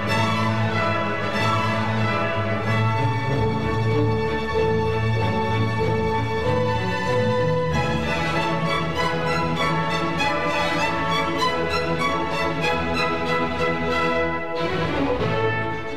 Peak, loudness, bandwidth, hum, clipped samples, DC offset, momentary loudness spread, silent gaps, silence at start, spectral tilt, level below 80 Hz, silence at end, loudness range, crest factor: -8 dBFS; -22 LUFS; 13.5 kHz; none; under 0.1%; 2%; 2 LU; none; 0 s; -6 dB/octave; -42 dBFS; 0 s; 0 LU; 14 dB